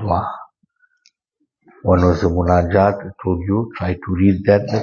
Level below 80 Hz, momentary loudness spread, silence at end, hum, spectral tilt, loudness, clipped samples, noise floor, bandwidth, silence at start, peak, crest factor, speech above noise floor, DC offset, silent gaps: -38 dBFS; 10 LU; 0 s; none; -9 dB/octave; -17 LUFS; under 0.1%; -71 dBFS; 7 kHz; 0 s; 0 dBFS; 18 dB; 55 dB; under 0.1%; none